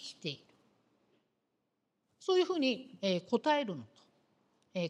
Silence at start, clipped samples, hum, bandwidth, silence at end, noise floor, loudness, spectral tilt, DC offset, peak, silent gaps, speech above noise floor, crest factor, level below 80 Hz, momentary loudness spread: 0 s; under 0.1%; none; 10 kHz; 0 s; -83 dBFS; -34 LUFS; -5 dB/octave; under 0.1%; -16 dBFS; none; 50 dB; 20 dB; -88 dBFS; 13 LU